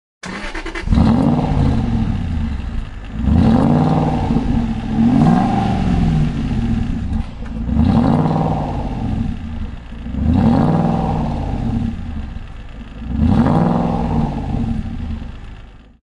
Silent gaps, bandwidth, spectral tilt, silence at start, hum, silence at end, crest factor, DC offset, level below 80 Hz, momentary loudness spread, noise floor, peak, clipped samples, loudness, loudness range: none; 10.5 kHz; -8.5 dB/octave; 0.25 s; none; 0.3 s; 16 dB; under 0.1%; -24 dBFS; 16 LU; -37 dBFS; 0 dBFS; under 0.1%; -17 LUFS; 4 LU